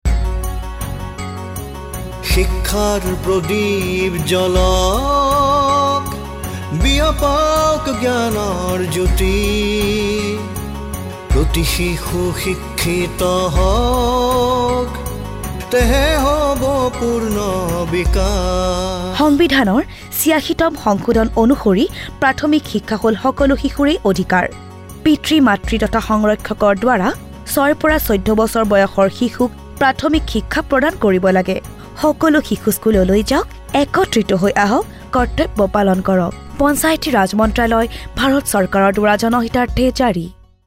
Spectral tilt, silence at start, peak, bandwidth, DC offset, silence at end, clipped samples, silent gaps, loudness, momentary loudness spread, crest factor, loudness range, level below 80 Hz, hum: -5 dB/octave; 0.05 s; -2 dBFS; 16 kHz; under 0.1%; 0.35 s; under 0.1%; none; -16 LUFS; 10 LU; 12 dB; 3 LU; -24 dBFS; none